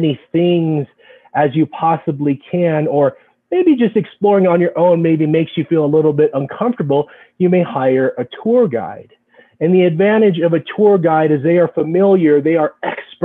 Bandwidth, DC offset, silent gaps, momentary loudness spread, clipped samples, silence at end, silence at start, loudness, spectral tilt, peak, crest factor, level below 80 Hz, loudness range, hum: 4 kHz; under 0.1%; none; 7 LU; under 0.1%; 0 s; 0 s; -14 LUFS; -10.5 dB/octave; -2 dBFS; 12 dB; -62 dBFS; 3 LU; none